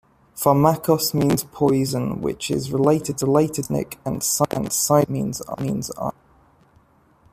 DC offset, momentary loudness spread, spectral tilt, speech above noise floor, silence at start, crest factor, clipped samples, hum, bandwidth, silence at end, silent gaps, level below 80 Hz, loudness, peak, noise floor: under 0.1%; 10 LU; -5.5 dB/octave; 36 dB; 0.35 s; 18 dB; under 0.1%; none; 15.5 kHz; 1.2 s; none; -52 dBFS; -21 LUFS; -2 dBFS; -57 dBFS